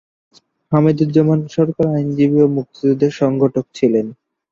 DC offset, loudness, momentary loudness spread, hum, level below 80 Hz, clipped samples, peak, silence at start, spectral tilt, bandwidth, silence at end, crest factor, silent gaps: under 0.1%; -16 LUFS; 5 LU; none; -56 dBFS; under 0.1%; -2 dBFS; 0.7 s; -9 dB/octave; 7.4 kHz; 0.4 s; 14 dB; none